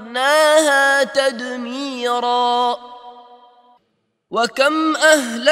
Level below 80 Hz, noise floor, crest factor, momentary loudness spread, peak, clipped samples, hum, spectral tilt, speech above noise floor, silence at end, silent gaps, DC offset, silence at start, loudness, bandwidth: -72 dBFS; -68 dBFS; 18 dB; 13 LU; 0 dBFS; under 0.1%; none; -1 dB/octave; 52 dB; 0 s; none; under 0.1%; 0 s; -16 LUFS; 15.5 kHz